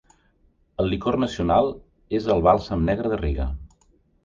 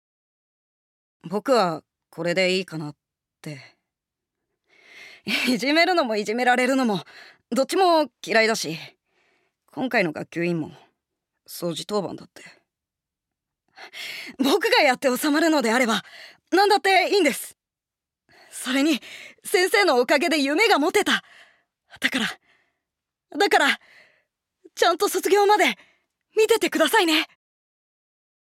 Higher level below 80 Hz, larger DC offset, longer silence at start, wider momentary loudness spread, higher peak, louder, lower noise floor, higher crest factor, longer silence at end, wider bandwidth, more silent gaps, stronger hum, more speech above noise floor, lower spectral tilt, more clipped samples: first, -34 dBFS vs -74 dBFS; neither; second, 0.8 s vs 1.25 s; second, 12 LU vs 18 LU; first, -2 dBFS vs -6 dBFS; about the same, -23 LUFS vs -21 LUFS; second, -62 dBFS vs -88 dBFS; about the same, 22 dB vs 18 dB; second, 0.6 s vs 1.15 s; second, 7.6 kHz vs 16.5 kHz; neither; neither; second, 40 dB vs 67 dB; first, -7.5 dB/octave vs -3 dB/octave; neither